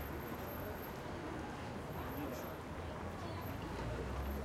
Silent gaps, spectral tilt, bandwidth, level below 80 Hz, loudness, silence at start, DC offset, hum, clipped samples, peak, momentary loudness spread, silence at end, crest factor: none; -6 dB/octave; 16 kHz; -52 dBFS; -45 LUFS; 0 s; under 0.1%; none; under 0.1%; -30 dBFS; 3 LU; 0 s; 14 dB